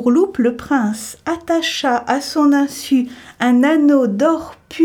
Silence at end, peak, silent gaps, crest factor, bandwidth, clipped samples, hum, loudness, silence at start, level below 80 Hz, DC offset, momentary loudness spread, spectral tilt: 0 s; -2 dBFS; none; 12 dB; 17 kHz; under 0.1%; none; -16 LUFS; 0 s; -54 dBFS; under 0.1%; 11 LU; -4.5 dB/octave